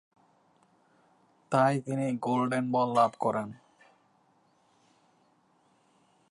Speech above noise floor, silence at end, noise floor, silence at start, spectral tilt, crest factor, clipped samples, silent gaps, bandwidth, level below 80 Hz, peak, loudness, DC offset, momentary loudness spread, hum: 40 dB; 2.75 s; -68 dBFS; 1.5 s; -7 dB/octave; 20 dB; under 0.1%; none; 11.5 kHz; -80 dBFS; -12 dBFS; -28 LUFS; under 0.1%; 6 LU; none